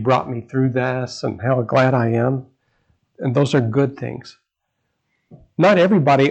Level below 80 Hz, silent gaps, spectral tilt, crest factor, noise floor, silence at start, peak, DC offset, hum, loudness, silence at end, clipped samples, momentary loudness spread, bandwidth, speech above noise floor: -60 dBFS; none; -7.5 dB/octave; 16 dB; -74 dBFS; 0 s; -4 dBFS; under 0.1%; none; -18 LUFS; 0 s; under 0.1%; 13 LU; 8.6 kHz; 57 dB